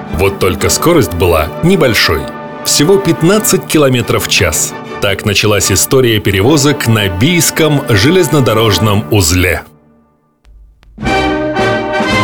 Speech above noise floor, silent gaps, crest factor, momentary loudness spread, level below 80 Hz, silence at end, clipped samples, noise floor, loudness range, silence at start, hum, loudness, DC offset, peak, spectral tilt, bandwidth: 42 dB; none; 10 dB; 5 LU; -30 dBFS; 0 s; under 0.1%; -51 dBFS; 3 LU; 0 s; none; -10 LUFS; under 0.1%; 0 dBFS; -4 dB/octave; over 20 kHz